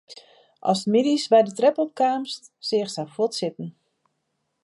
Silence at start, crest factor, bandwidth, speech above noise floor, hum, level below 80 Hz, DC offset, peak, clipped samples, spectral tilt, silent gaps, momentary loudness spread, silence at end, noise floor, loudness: 0.1 s; 18 dB; 11.5 kHz; 53 dB; none; -78 dBFS; under 0.1%; -6 dBFS; under 0.1%; -5 dB/octave; none; 13 LU; 0.95 s; -76 dBFS; -23 LUFS